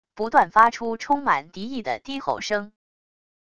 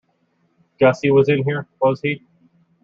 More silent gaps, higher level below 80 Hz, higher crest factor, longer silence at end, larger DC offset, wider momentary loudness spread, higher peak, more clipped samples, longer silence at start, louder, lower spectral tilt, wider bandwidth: neither; about the same, -60 dBFS vs -60 dBFS; about the same, 22 dB vs 18 dB; about the same, 0.75 s vs 0.65 s; first, 0.5% vs under 0.1%; first, 12 LU vs 9 LU; about the same, -2 dBFS vs -2 dBFS; neither; second, 0.15 s vs 0.8 s; second, -22 LUFS vs -18 LUFS; second, -4 dB/octave vs -7.5 dB/octave; first, 11 kHz vs 7.4 kHz